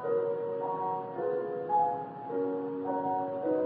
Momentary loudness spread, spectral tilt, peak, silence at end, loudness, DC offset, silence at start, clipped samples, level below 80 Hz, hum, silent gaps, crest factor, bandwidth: 5 LU; -7 dB/octave; -18 dBFS; 0 s; -32 LUFS; under 0.1%; 0 s; under 0.1%; -82 dBFS; none; none; 14 dB; 4.3 kHz